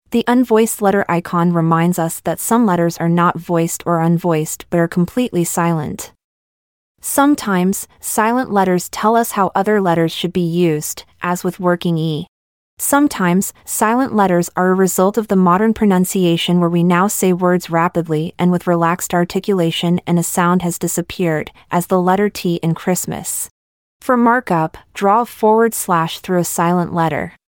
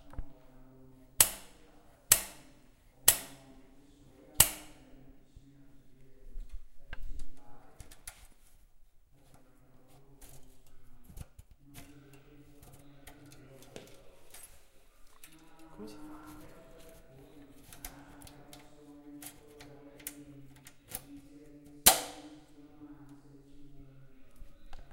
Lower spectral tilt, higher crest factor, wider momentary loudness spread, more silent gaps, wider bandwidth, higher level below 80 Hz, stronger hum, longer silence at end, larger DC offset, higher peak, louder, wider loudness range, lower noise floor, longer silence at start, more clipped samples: first, -5.5 dB/octave vs -0.5 dB/octave; second, 14 dB vs 36 dB; second, 7 LU vs 30 LU; first, 6.24-6.95 s, 12.28-12.77 s, 23.51-24.00 s vs none; first, 18 kHz vs 16 kHz; about the same, -52 dBFS vs -52 dBFS; neither; first, 0.2 s vs 0 s; neither; about the same, -2 dBFS vs -2 dBFS; first, -16 LUFS vs -28 LUFS; second, 4 LU vs 25 LU; first, under -90 dBFS vs -60 dBFS; about the same, 0.1 s vs 0 s; neither